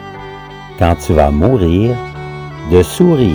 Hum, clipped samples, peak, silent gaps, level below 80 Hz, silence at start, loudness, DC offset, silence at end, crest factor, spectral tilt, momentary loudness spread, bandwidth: none; 0.1%; 0 dBFS; none; -26 dBFS; 0 s; -12 LUFS; under 0.1%; 0 s; 12 dB; -7.5 dB/octave; 18 LU; over 20 kHz